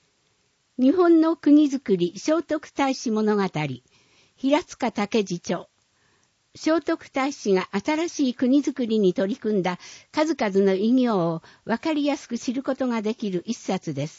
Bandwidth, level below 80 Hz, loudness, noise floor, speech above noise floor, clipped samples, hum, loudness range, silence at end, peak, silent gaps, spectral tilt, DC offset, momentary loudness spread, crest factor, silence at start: 8 kHz; -68 dBFS; -23 LUFS; -68 dBFS; 45 dB; under 0.1%; none; 5 LU; 0.1 s; -8 dBFS; none; -5.5 dB/octave; under 0.1%; 11 LU; 16 dB; 0.8 s